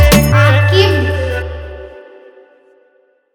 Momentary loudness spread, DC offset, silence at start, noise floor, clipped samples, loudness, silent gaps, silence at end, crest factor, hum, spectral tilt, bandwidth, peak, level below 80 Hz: 22 LU; under 0.1%; 0 s; -54 dBFS; 0.1%; -11 LUFS; none; 1.35 s; 14 dB; none; -5.5 dB/octave; over 20 kHz; 0 dBFS; -22 dBFS